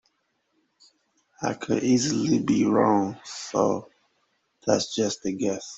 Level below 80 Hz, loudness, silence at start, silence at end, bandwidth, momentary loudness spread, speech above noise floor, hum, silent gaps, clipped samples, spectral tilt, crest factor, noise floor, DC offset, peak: -64 dBFS; -25 LUFS; 1.4 s; 0 s; 8.2 kHz; 11 LU; 49 dB; none; none; under 0.1%; -5 dB/octave; 20 dB; -73 dBFS; under 0.1%; -6 dBFS